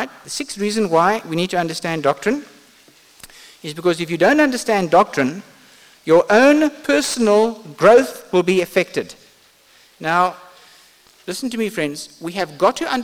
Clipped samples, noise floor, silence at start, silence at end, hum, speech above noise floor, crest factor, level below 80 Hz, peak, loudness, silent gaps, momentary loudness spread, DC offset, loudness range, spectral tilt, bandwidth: under 0.1%; -52 dBFS; 0 s; 0 s; none; 35 dB; 16 dB; -58 dBFS; -2 dBFS; -17 LUFS; none; 15 LU; under 0.1%; 8 LU; -4.5 dB/octave; 18 kHz